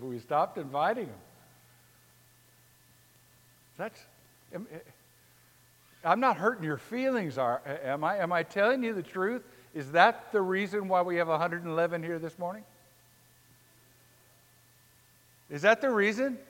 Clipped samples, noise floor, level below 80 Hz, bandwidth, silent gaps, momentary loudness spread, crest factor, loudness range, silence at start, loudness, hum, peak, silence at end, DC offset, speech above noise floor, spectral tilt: under 0.1%; -62 dBFS; -78 dBFS; 17 kHz; none; 17 LU; 26 dB; 19 LU; 0 s; -29 LUFS; none; -6 dBFS; 0.05 s; under 0.1%; 33 dB; -5.5 dB/octave